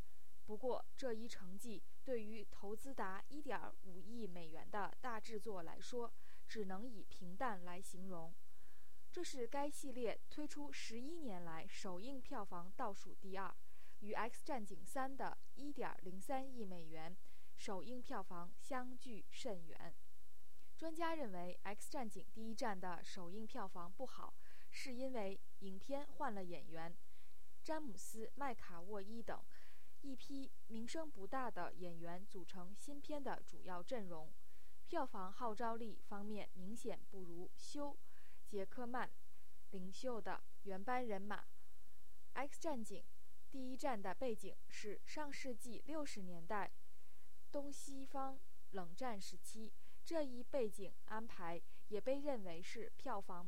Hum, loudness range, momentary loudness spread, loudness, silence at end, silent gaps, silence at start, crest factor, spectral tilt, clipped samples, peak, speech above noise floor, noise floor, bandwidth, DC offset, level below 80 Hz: none; 3 LU; 11 LU; -50 LUFS; 0 s; none; 0.15 s; 20 dB; -5 dB/octave; under 0.1%; -28 dBFS; 24 dB; -73 dBFS; 16.5 kHz; 1%; -72 dBFS